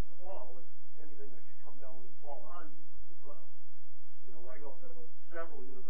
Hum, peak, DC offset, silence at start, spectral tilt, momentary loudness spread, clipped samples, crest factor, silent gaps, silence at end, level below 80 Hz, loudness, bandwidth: none; -20 dBFS; 8%; 0 s; -9 dB/octave; 15 LU; under 0.1%; 22 dB; none; 0 s; -66 dBFS; -53 LUFS; 3.4 kHz